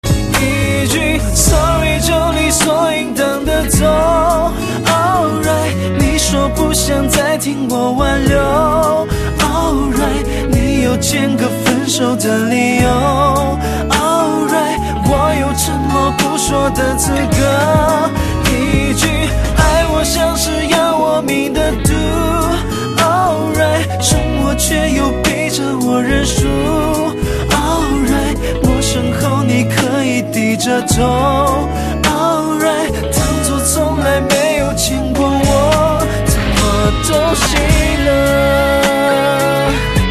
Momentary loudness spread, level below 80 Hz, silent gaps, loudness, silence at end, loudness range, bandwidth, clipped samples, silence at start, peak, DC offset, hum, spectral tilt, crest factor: 4 LU; -22 dBFS; none; -13 LUFS; 0 s; 2 LU; 14 kHz; under 0.1%; 0.05 s; 0 dBFS; under 0.1%; none; -4.5 dB/octave; 12 dB